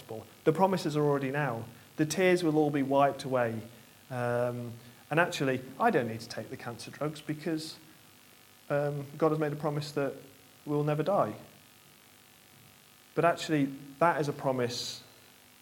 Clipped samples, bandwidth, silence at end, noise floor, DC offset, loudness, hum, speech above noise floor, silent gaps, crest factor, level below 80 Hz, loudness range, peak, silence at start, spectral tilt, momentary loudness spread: under 0.1%; 17.5 kHz; 0.6 s; -58 dBFS; under 0.1%; -31 LUFS; none; 28 dB; none; 22 dB; -74 dBFS; 6 LU; -8 dBFS; 0 s; -6 dB/octave; 15 LU